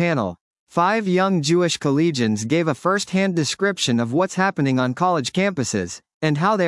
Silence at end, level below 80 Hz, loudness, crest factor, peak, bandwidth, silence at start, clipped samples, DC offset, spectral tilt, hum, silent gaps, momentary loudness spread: 0 s; -66 dBFS; -20 LUFS; 16 dB; -4 dBFS; 12 kHz; 0 s; under 0.1%; under 0.1%; -5 dB/octave; none; 0.41-0.67 s, 6.14-6.21 s; 5 LU